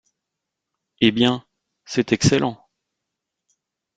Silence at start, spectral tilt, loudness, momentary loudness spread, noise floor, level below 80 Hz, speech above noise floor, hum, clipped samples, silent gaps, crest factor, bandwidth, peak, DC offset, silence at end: 1 s; -5 dB/octave; -20 LUFS; 10 LU; -83 dBFS; -52 dBFS; 64 dB; none; under 0.1%; none; 22 dB; 9.2 kHz; -2 dBFS; under 0.1%; 1.4 s